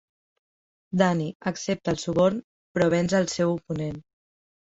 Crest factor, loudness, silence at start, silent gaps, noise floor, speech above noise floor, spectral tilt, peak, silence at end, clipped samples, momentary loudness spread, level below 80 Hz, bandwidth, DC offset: 20 dB; -25 LUFS; 0.9 s; 1.35-1.40 s, 2.44-2.75 s; under -90 dBFS; over 66 dB; -6 dB/octave; -6 dBFS; 0.75 s; under 0.1%; 10 LU; -58 dBFS; 8 kHz; under 0.1%